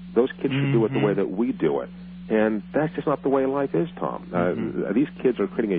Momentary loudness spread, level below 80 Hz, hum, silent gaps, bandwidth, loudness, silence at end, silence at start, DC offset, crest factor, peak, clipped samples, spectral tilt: 6 LU; -54 dBFS; none; none; 4.5 kHz; -24 LUFS; 0 s; 0 s; under 0.1%; 16 dB; -8 dBFS; under 0.1%; -7 dB/octave